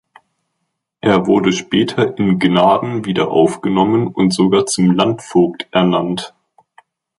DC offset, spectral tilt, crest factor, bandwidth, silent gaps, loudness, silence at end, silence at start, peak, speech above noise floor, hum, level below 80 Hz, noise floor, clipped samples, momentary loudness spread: under 0.1%; -5.5 dB/octave; 14 dB; 11.5 kHz; none; -15 LUFS; 0.9 s; 1.05 s; -2 dBFS; 59 dB; none; -52 dBFS; -73 dBFS; under 0.1%; 5 LU